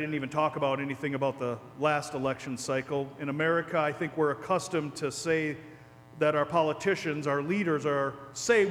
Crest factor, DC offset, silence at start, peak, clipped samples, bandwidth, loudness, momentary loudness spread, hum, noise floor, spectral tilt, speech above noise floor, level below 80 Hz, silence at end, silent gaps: 18 dB; under 0.1%; 0 s; -12 dBFS; under 0.1%; 14.5 kHz; -30 LUFS; 7 LU; none; -50 dBFS; -5 dB/octave; 21 dB; -68 dBFS; 0 s; none